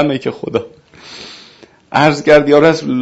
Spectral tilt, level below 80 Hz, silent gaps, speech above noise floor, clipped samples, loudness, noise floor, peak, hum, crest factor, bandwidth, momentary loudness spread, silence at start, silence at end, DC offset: -6 dB/octave; -50 dBFS; none; 30 dB; 0.2%; -12 LUFS; -43 dBFS; 0 dBFS; none; 14 dB; 8 kHz; 23 LU; 0 s; 0 s; under 0.1%